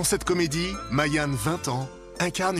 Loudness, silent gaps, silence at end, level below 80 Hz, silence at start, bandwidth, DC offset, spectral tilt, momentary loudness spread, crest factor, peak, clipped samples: -26 LUFS; none; 0 s; -44 dBFS; 0 s; 15 kHz; under 0.1%; -4 dB/octave; 6 LU; 18 dB; -8 dBFS; under 0.1%